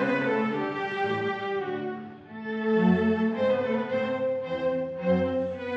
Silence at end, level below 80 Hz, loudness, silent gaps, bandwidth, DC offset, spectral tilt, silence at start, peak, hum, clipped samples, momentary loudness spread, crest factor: 0 s; -62 dBFS; -27 LUFS; none; 7.4 kHz; under 0.1%; -8 dB/octave; 0 s; -10 dBFS; none; under 0.1%; 10 LU; 16 dB